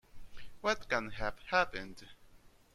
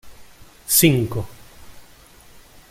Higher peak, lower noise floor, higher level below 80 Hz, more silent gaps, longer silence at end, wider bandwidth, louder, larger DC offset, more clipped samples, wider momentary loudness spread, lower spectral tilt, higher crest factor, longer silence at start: second, -14 dBFS vs -2 dBFS; first, -60 dBFS vs -47 dBFS; second, -54 dBFS vs -48 dBFS; neither; second, 0.25 s vs 0.9 s; second, 14.5 kHz vs 16.5 kHz; second, -35 LUFS vs -17 LUFS; neither; neither; second, 15 LU vs 23 LU; about the same, -3.5 dB/octave vs -4 dB/octave; about the same, 24 dB vs 22 dB; about the same, 0.15 s vs 0.05 s